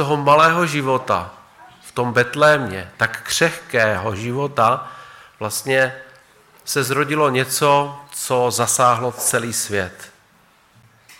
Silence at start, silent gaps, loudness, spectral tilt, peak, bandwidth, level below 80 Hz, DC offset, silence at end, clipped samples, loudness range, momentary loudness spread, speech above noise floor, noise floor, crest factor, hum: 0 s; none; -18 LUFS; -3.5 dB/octave; -4 dBFS; 17 kHz; -60 dBFS; under 0.1%; 0.05 s; under 0.1%; 3 LU; 12 LU; 36 dB; -54 dBFS; 16 dB; none